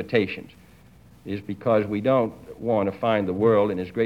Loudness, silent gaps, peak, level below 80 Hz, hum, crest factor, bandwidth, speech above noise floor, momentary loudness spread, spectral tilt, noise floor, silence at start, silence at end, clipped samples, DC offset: -24 LUFS; none; -8 dBFS; -58 dBFS; none; 16 dB; 12 kHz; 28 dB; 13 LU; -8 dB/octave; -51 dBFS; 0 s; 0 s; under 0.1%; under 0.1%